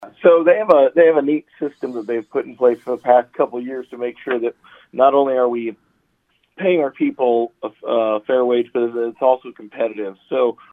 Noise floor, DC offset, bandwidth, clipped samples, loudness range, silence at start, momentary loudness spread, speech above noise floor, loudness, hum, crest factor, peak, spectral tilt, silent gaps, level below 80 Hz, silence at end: -65 dBFS; under 0.1%; 4.1 kHz; under 0.1%; 4 LU; 0 s; 14 LU; 47 dB; -18 LUFS; none; 18 dB; 0 dBFS; -8 dB/octave; none; -72 dBFS; 0.2 s